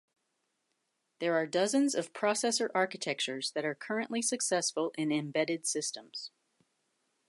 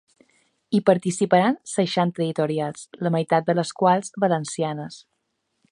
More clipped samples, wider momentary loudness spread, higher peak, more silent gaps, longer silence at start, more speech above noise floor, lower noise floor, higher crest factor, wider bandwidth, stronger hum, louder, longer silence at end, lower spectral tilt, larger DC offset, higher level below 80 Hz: neither; about the same, 7 LU vs 8 LU; second, -16 dBFS vs -2 dBFS; neither; first, 1.2 s vs 0.7 s; second, 49 dB vs 53 dB; first, -81 dBFS vs -75 dBFS; about the same, 18 dB vs 20 dB; about the same, 11.5 kHz vs 11 kHz; neither; second, -32 LUFS vs -22 LUFS; first, 1 s vs 0.75 s; second, -2.5 dB/octave vs -5.5 dB/octave; neither; second, -88 dBFS vs -70 dBFS